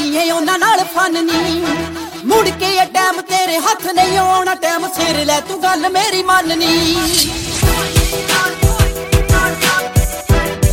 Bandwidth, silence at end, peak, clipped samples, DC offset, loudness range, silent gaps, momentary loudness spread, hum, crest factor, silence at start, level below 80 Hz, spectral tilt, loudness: 17 kHz; 0 s; 0 dBFS; under 0.1%; under 0.1%; 1 LU; none; 4 LU; none; 14 dB; 0 s; -24 dBFS; -3.5 dB/octave; -14 LUFS